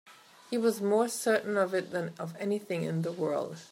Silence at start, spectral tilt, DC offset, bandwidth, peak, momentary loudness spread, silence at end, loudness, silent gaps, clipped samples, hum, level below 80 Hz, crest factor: 0.05 s; -5 dB/octave; under 0.1%; 16 kHz; -14 dBFS; 8 LU; 0.05 s; -31 LUFS; none; under 0.1%; none; -84 dBFS; 16 dB